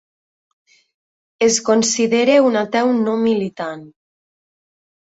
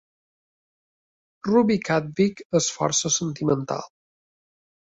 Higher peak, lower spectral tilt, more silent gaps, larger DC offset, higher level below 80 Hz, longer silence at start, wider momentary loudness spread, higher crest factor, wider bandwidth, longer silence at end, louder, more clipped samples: first, -2 dBFS vs -6 dBFS; about the same, -3.5 dB/octave vs -4 dB/octave; second, none vs 2.45-2.50 s; neither; about the same, -64 dBFS vs -62 dBFS; about the same, 1.4 s vs 1.45 s; first, 13 LU vs 8 LU; about the same, 16 dB vs 18 dB; about the same, 8.4 kHz vs 8.4 kHz; first, 1.25 s vs 1 s; first, -16 LUFS vs -23 LUFS; neither